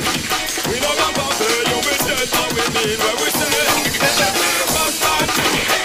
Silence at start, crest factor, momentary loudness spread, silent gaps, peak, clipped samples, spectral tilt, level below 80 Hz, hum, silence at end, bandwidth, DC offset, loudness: 0 s; 16 dB; 3 LU; none; -2 dBFS; under 0.1%; -1.5 dB/octave; -42 dBFS; none; 0 s; 16 kHz; under 0.1%; -16 LUFS